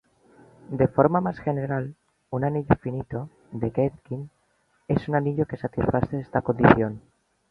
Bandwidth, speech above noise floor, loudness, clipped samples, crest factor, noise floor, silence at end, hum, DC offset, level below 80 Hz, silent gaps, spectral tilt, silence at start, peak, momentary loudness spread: 5.4 kHz; 44 dB; -25 LUFS; under 0.1%; 24 dB; -67 dBFS; 0.5 s; none; under 0.1%; -48 dBFS; none; -10 dB/octave; 0.7 s; -2 dBFS; 16 LU